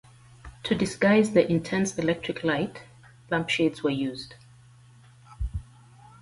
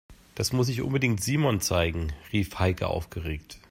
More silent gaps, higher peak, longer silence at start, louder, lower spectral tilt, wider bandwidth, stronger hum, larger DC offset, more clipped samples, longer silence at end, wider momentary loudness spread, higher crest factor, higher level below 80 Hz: neither; first, -6 dBFS vs -10 dBFS; first, 0.45 s vs 0.1 s; about the same, -26 LUFS vs -27 LUFS; about the same, -5.5 dB/octave vs -5 dB/octave; second, 11.5 kHz vs 16 kHz; neither; neither; neither; first, 0.6 s vs 0.15 s; first, 16 LU vs 10 LU; about the same, 20 dB vs 18 dB; about the same, -46 dBFS vs -44 dBFS